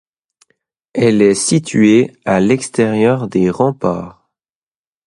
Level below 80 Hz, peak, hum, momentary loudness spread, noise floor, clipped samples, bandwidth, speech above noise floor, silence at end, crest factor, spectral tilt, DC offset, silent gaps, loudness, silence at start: -50 dBFS; 0 dBFS; none; 9 LU; under -90 dBFS; under 0.1%; 11.5 kHz; over 77 dB; 0.95 s; 14 dB; -5.5 dB/octave; under 0.1%; none; -14 LUFS; 0.95 s